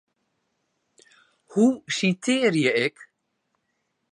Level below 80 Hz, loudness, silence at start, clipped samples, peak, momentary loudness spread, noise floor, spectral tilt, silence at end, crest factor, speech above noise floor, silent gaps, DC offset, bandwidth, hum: -76 dBFS; -23 LUFS; 1.5 s; under 0.1%; -6 dBFS; 6 LU; -76 dBFS; -4.5 dB/octave; 1.1 s; 20 dB; 53 dB; none; under 0.1%; 11 kHz; none